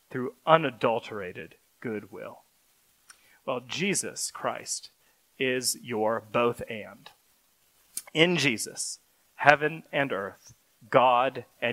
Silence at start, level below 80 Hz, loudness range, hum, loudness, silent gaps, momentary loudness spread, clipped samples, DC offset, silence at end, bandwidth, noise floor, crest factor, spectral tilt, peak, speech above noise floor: 0.1 s; -70 dBFS; 8 LU; none; -27 LUFS; none; 18 LU; under 0.1%; under 0.1%; 0 s; 16 kHz; -66 dBFS; 28 dB; -3.5 dB/octave; 0 dBFS; 39 dB